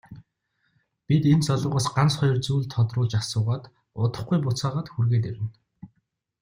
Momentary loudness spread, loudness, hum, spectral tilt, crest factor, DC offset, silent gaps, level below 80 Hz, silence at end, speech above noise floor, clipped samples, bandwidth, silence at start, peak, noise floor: 9 LU; -24 LUFS; none; -6.5 dB/octave; 16 dB; under 0.1%; none; -56 dBFS; 0.55 s; 51 dB; under 0.1%; 15.5 kHz; 0.1 s; -8 dBFS; -74 dBFS